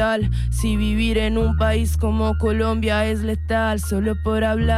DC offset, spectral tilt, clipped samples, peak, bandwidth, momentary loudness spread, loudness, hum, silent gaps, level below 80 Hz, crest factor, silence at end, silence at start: under 0.1%; -6.5 dB/octave; under 0.1%; -10 dBFS; 14.5 kHz; 3 LU; -21 LUFS; none; none; -24 dBFS; 10 dB; 0 s; 0 s